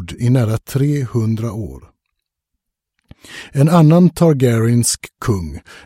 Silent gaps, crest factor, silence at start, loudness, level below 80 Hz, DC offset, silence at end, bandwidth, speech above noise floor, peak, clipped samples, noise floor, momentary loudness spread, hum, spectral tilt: none; 16 dB; 0 s; -15 LUFS; -42 dBFS; under 0.1%; 0.05 s; 16.5 kHz; 62 dB; 0 dBFS; under 0.1%; -77 dBFS; 17 LU; none; -6.5 dB/octave